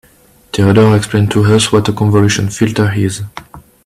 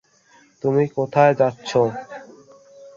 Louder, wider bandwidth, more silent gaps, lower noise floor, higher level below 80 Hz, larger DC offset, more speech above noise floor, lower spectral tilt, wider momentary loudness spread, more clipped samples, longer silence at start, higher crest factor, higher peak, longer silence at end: first, -12 LUFS vs -19 LUFS; first, 14 kHz vs 7.6 kHz; neither; second, -47 dBFS vs -55 dBFS; first, -42 dBFS vs -62 dBFS; neither; about the same, 36 dB vs 36 dB; about the same, -5.5 dB/octave vs -6.5 dB/octave; second, 13 LU vs 19 LU; neither; about the same, 0.55 s vs 0.65 s; second, 12 dB vs 20 dB; about the same, 0 dBFS vs -2 dBFS; first, 0.25 s vs 0.05 s